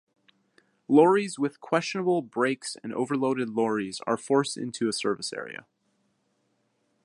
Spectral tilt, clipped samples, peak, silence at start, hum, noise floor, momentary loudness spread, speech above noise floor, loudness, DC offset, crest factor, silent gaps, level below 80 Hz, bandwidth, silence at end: -5 dB/octave; under 0.1%; -6 dBFS; 0.9 s; none; -73 dBFS; 12 LU; 47 dB; -26 LUFS; under 0.1%; 22 dB; none; -76 dBFS; 11.5 kHz; 1.5 s